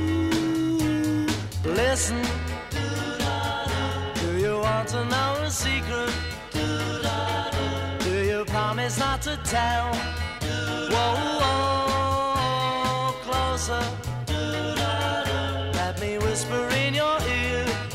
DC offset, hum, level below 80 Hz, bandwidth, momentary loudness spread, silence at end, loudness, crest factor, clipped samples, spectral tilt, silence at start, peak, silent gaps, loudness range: under 0.1%; none; -38 dBFS; 16 kHz; 5 LU; 0 s; -25 LUFS; 14 dB; under 0.1%; -4.5 dB/octave; 0 s; -10 dBFS; none; 2 LU